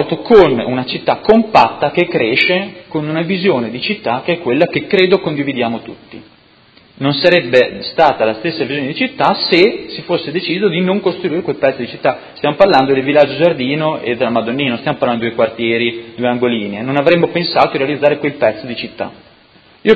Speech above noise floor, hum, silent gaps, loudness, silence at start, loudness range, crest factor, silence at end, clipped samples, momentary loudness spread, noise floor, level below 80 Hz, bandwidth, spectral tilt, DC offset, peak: 33 dB; none; none; -14 LUFS; 0 s; 2 LU; 14 dB; 0 s; 0.2%; 9 LU; -47 dBFS; -50 dBFS; 8 kHz; -7 dB/octave; under 0.1%; 0 dBFS